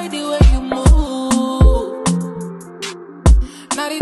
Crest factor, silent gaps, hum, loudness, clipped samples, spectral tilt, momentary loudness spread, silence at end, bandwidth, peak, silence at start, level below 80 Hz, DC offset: 14 dB; none; none; -16 LUFS; under 0.1%; -6 dB/octave; 14 LU; 0 s; 12 kHz; 0 dBFS; 0 s; -16 dBFS; under 0.1%